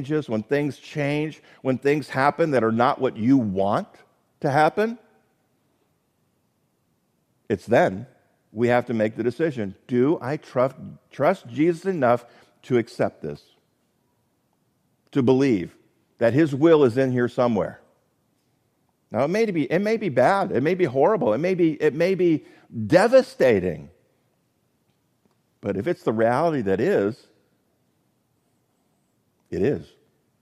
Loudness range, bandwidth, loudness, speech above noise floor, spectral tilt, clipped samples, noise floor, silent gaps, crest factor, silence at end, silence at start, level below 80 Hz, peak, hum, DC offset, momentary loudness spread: 7 LU; 13.5 kHz; -22 LUFS; 48 dB; -7.5 dB/octave; under 0.1%; -69 dBFS; none; 20 dB; 0.55 s; 0 s; -66 dBFS; -4 dBFS; none; under 0.1%; 12 LU